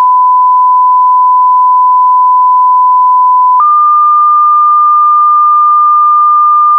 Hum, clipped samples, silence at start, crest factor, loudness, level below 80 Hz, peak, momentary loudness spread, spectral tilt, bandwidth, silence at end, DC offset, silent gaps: none; under 0.1%; 0 s; 4 dB; -5 LUFS; -82 dBFS; -2 dBFS; 1 LU; -5 dB/octave; 1.5 kHz; 0 s; under 0.1%; none